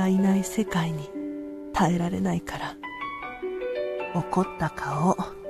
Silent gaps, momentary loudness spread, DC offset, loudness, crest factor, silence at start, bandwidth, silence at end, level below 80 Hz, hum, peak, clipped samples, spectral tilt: none; 11 LU; under 0.1%; -28 LUFS; 18 dB; 0 s; 13.5 kHz; 0 s; -50 dBFS; none; -8 dBFS; under 0.1%; -6.5 dB/octave